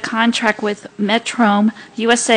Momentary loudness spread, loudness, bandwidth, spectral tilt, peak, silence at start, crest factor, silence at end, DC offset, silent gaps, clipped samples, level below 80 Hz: 8 LU; -17 LUFS; 10 kHz; -3.5 dB/octave; 0 dBFS; 0 s; 16 dB; 0 s; under 0.1%; none; under 0.1%; -62 dBFS